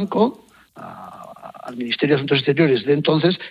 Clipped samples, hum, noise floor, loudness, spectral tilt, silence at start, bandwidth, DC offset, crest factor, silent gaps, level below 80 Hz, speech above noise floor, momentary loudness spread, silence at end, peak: under 0.1%; none; -40 dBFS; -18 LUFS; -8 dB/octave; 0 s; 9.8 kHz; under 0.1%; 18 dB; none; -60 dBFS; 22 dB; 21 LU; 0 s; -2 dBFS